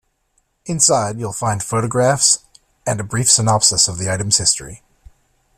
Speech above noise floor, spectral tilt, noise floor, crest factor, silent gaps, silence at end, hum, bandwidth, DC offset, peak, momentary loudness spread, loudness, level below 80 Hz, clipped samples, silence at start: 48 dB; -2.5 dB/octave; -65 dBFS; 18 dB; none; 0.8 s; none; 15.5 kHz; under 0.1%; 0 dBFS; 11 LU; -15 LUFS; -48 dBFS; under 0.1%; 0.65 s